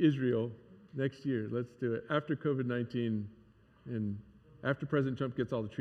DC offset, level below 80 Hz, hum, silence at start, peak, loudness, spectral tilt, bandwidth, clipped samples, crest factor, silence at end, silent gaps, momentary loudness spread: under 0.1%; -70 dBFS; none; 0 s; -16 dBFS; -35 LUFS; -9 dB/octave; 7.6 kHz; under 0.1%; 18 dB; 0 s; none; 10 LU